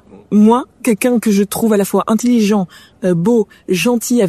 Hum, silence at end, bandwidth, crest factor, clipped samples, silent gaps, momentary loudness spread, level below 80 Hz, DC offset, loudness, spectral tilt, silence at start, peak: none; 0 s; 14 kHz; 12 dB; under 0.1%; none; 6 LU; -54 dBFS; under 0.1%; -14 LUFS; -5.5 dB/octave; 0.15 s; -2 dBFS